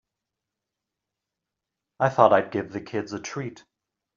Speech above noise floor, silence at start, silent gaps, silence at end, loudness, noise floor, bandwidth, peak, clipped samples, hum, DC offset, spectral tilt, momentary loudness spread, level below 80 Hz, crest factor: 62 dB; 2 s; none; 0.6 s; -24 LUFS; -86 dBFS; 7.4 kHz; -2 dBFS; under 0.1%; none; under 0.1%; -5 dB/octave; 15 LU; -68 dBFS; 26 dB